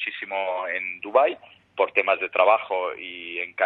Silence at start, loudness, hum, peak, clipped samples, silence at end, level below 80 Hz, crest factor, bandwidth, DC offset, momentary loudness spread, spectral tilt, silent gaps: 0 s; -24 LUFS; none; -2 dBFS; under 0.1%; 0 s; -76 dBFS; 22 dB; 4.6 kHz; under 0.1%; 12 LU; -5.5 dB/octave; none